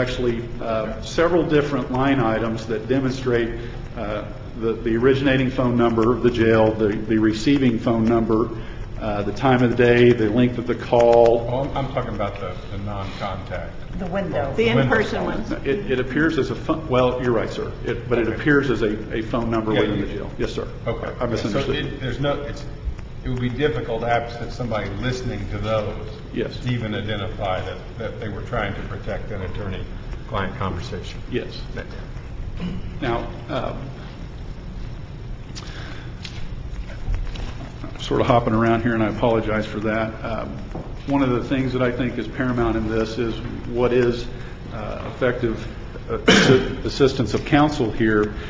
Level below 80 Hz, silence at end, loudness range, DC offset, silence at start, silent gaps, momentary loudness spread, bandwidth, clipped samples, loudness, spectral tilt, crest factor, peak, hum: -34 dBFS; 0 s; 11 LU; under 0.1%; 0 s; none; 16 LU; 7.8 kHz; under 0.1%; -22 LUFS; -6.5 dB/octave; 20 dB; -2 dBFS; none